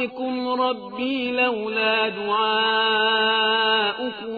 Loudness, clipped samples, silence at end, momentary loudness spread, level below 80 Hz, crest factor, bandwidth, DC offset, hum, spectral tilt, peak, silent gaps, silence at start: -21 LUFS; under 0.1%; 0 s; 8 LU; -68 dBFS; 14 dB; 5 kHz; under 0.1%; none; -5.5 dB/octave; -8 dBFS; none; 0 s